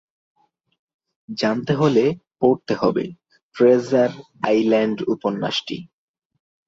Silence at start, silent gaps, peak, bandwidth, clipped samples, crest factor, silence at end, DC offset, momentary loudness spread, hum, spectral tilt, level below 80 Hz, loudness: 1.3 s; 3.43-3.51 s; -4 dBFS; 7.8 kHz; under 0.1%; 18 dB; 0.8 s; under 0.1%; 10 LU; none; -6.5 dB/octave; -62 dBFS; -20 LUFS